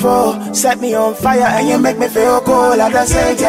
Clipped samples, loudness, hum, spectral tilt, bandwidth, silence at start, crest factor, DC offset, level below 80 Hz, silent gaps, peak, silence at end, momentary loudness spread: under 0.1%; -12 LUFS; none; -4 dB/octave; 16 kHz; 0 s; 12 dB; under 0.1%; -32 dBFS; none; 0 dBFS; 0 s; 3 LU